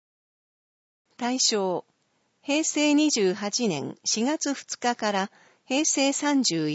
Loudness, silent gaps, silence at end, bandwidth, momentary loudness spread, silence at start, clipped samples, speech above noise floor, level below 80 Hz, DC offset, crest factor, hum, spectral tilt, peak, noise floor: -25 LUFS; none; 0 s; 8.2 kHz; 8 LU; 1.2 s; under 0.1%; 46 dB; -80 dBFS; under 0.1%; 16 dB; none; -2.5 dB/octave; -10 dBFS; -71 dBFS